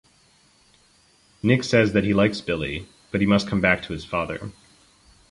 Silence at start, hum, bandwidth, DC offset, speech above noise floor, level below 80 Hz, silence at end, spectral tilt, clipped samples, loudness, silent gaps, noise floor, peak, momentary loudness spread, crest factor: 1.45 s; none; 11.5 kHz; under 0.1%; 37 dB; -48 dBFS; 0.8 s; -6 dB/octave; under 0.1%; -22 LUFS; none; -59 dBFS; -4 dBFS; 12 LU; 20 dB